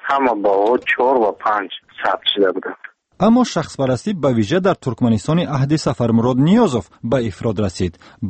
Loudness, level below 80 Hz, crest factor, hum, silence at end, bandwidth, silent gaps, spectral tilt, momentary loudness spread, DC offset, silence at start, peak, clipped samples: -17 LUFS; -48 dBFS; 14 dB; none; 0 s; 8.8 kHz; none; -6.5 dB/octave; 8 LU; under 0.1%; 0.05 s; -4 dBFS; under 0.1%